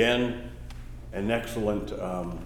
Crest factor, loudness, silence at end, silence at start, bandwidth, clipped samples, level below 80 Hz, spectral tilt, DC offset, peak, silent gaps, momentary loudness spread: 20 dB; -30 LUFS; 0 s; 0 s; 18.5 kHz; under 0.1%; -42 dBFS; -5.5 dB/octave; under 0.1%; -8 dBFS; none; 16 LU